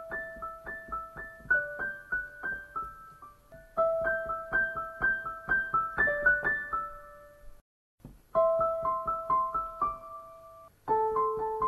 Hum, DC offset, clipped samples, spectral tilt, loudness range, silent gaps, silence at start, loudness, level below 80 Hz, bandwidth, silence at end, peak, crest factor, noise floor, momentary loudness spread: none; under 0.1%; under 0.1%; -6 dB/octave; 5 LU; 7.61-7.98 s; 0 s; -30 LUFS; -54 dBFS; 12.5 kHz; 0 s; -14 dBFS; 18 dB; -53 dBFS; 16 LU